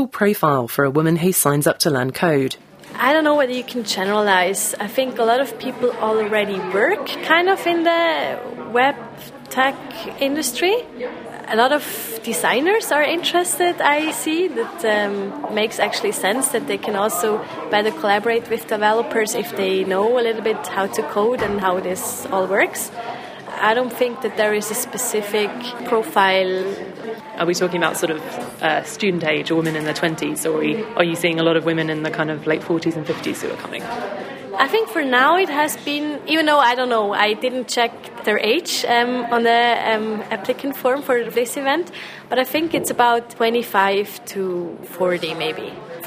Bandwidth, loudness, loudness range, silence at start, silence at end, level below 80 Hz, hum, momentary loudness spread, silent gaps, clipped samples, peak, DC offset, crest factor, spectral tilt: 16 kHz; -19 LUFS; 3 LU; 0 s; 0 s; -62 dBFS; none; 10 LU; none; under 0.1%; 0 dBFS; under 0.1%; 20 dB; -3.5 dB/octave